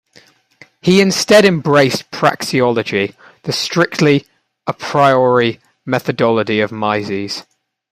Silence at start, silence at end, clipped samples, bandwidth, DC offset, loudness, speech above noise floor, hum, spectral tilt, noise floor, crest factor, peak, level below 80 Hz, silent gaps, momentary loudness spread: 0.85 s; 0.5 s; under 0.1%; 15.5 kHz; under 0.1%; -14 LUFS; 35 dB; none; -5 dB/octave; -49 dBFS; 16 dB; 0 dBFS; -56 dBFS; none; 13 LU